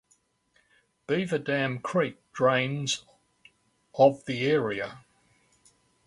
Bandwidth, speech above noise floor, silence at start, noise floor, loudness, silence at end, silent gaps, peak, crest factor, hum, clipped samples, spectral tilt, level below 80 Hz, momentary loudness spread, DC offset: 11.5 kHz; 43 dB; 1.1 s; -69 dBFS; -27 LUFS; 1.1 s; none; -6 dBFS; 22 dB; none; under 0.1%; -5 dB/octave; -68 dBFS; 11 LU; under 0.1%